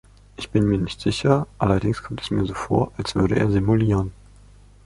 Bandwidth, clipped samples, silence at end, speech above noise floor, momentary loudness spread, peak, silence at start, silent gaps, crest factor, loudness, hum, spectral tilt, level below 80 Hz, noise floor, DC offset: 11.5 kHz; under 0.1%; 0.7 s; 27 dB; 7 LU; -2 dBFS; 0.4 s; none; 18 dB; -22 LUFS; 50 Hz at -35 dBFS; -7 dB/octave; -40 dBFS; -48 dBFS; under 0.1%